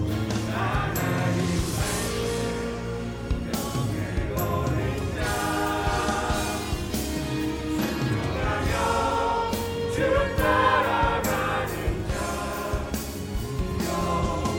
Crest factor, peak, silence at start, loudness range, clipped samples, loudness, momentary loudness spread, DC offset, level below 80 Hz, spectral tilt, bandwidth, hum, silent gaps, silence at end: 16 dB; -10 dBFS; 0 s; 4 LU; under 0.1%; -26 LUFS; 7 LU; under 0.1%; -36 dBFS; -5 dB/octave; 17 kHz; none; none; 0 s